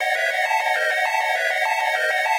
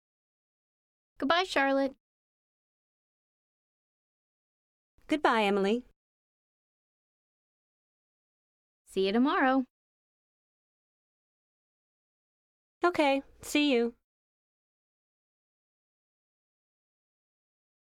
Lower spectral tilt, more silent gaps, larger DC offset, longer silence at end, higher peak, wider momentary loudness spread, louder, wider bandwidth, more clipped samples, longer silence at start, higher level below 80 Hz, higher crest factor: second, 5 dB/octave vs -4.5 dB/octave; second, none vs 2.00-4.98 s, 5.96-8.85 s, 9.70-12.81 s; neither; second, 0 s vs 4.05 s; first, -8 dBFS vs -12 dBFS; second, 1 LU vs 9 LU; first, -20 LUFS vs -28 LUFS; about the same, 16.5 kHz vs 16 kHz; neither; second, 0 s vs 1.2 s; second, under -90 dBFS vs -70 dBFS; second, 14 dB vs 24 dB